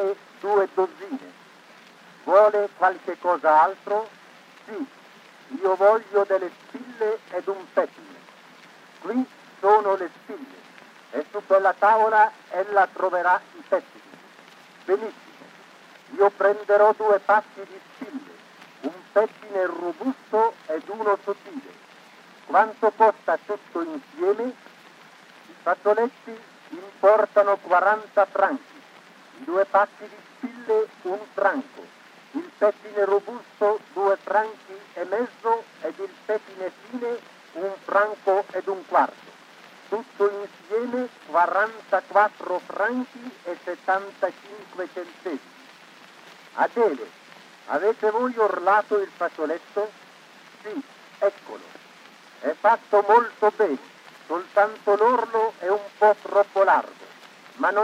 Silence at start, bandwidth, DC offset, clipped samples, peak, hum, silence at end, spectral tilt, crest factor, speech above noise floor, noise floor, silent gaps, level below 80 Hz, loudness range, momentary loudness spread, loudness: 0 s; 11 kHz; under 0.1%; under 0.1%; -4 dBFS; none; 0 s; -5 dB/octave; 20 dB; 27 dB; -50 dBFS; none; under -90 dBFS; 7 LU; 19 LU; -23 LUFS